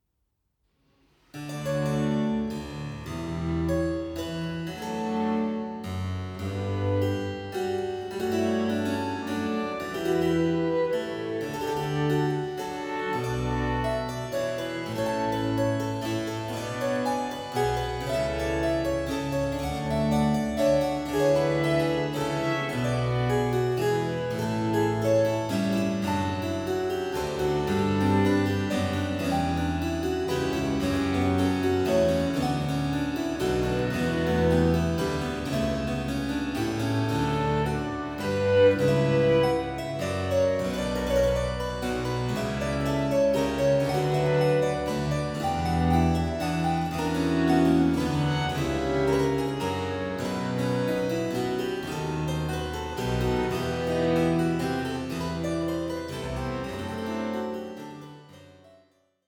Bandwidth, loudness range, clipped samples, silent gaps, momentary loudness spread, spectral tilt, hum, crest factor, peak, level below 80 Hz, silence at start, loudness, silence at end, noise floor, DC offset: 19 kHz; 5 LU; under 0.1%; none; 8 LU; -6.5 dB/octave; none; 16 dB; -10 dBFS; -44 dBFS; 1.35 s; -27 LUFS; 0.75 s; -76 dBFS; under 0.1%